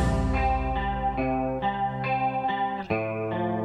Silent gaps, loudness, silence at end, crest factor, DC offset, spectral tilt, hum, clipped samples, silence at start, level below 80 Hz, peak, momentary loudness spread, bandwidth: none; -27 LUFS; 0 s; 14 dB; under 0.1%; -7.5 dB/octave; none; under 0.1%; 0 s; -34 dBFS; -12 dBFS; 3 LU; 10.5 kHz